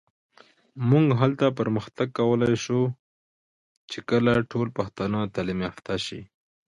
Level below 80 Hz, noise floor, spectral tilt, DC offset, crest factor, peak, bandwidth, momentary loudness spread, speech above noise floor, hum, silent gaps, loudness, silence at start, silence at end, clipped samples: -56 dBFS; under -90 dBFS; -7 dB/octave; under 0.1%; 18 dB; -8 dBFS; 11 kHz; 10 LU; over 66 dB; none; 2.99-3.88 s; -25 LUFS; 0.75 s; 0.4 s; under 0.1%